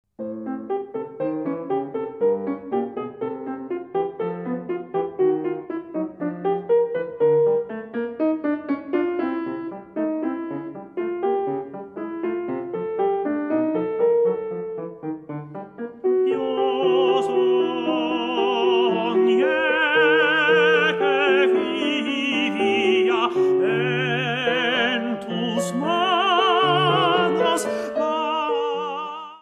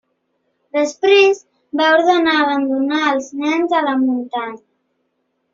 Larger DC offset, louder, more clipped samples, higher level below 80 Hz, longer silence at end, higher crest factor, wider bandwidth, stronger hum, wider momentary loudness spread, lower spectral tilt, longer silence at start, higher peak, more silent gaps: neither; second, -22 LUFS vs -16 LUFS; neither; about the same, -68 dBFS vs -64 dBFS; second, 0.05 s vs 0.95 s; about the same, 16 dB vs 16 dB; first, 12.5 kHz vs 7.6 kHz; neither; about the same, 13 LU vs 13 LU; first, -5 dB/octave vs 0 dB/octave; second, 0.2 s vs 0.75 s; second, -6 dBFS vs -2 dBFS; neither